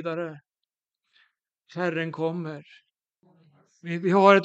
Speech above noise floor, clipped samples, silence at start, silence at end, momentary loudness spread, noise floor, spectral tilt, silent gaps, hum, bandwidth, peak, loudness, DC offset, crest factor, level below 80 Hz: 64 dB; under 0.1%; 0 s; 0 s; 23 LU; -88 dBFS; -7 dB/octave; none; none; 8 kHz; -2 dBFS; -26 LUFS; under 0.1%; 26 dB; -82 dBFS